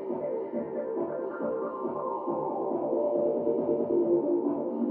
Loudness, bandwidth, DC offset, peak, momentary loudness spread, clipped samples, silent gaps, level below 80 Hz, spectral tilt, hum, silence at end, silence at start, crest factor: -30 LUFS; 3 kHz; under 0.1%; -14 dBFS; 7 LU; under 0.1%; none; -72 dBFS; -9.5 dB/octave; none; 0 s; 0 s; 14 dB